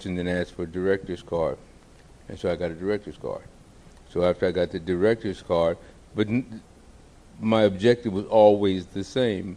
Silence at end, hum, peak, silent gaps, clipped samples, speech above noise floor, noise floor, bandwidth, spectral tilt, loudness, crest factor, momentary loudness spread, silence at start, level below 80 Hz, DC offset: 0 s; none; -4 dBFS; none; under 0.1%; 27 dB; -51 dBFS; 10 kHz; -7 dB/octave; -25 LUFS; 20 dB; 15 LU; 0 s; -52 dBFS; under 0.1%